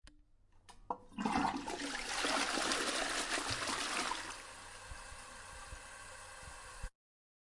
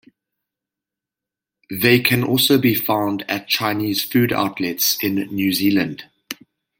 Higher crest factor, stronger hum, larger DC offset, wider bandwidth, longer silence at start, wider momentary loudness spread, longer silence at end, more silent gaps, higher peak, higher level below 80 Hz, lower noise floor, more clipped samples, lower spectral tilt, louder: about the same, 24 dB vs 20 dB; neither; neither; second, 11.5 kHz vs 17 kHz; second, 0.1 s vs 1.7 s; about the same, 16 LU vs 17 LU; first, 0.6 s vs 0.45 s; neither; second, -18 dBFS vs -2 dBFS; about the same, -58 dBFS vs -60 dBFS; second, -65 dBFS vs -87 dBFS; neither; second, -2 dB/octave vs -4 dB/octave; second, -37 LUFS vs -18 LUFS